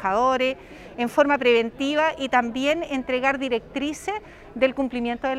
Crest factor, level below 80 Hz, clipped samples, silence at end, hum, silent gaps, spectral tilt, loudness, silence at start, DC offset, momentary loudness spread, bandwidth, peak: 18 dB; -52 dBFS; under 0.1%; 0 s; none; none; -4 dB/octave; -23 LUFS; 0 s; under 0.1%; 11 LU; 14 kHz; -6 dBFS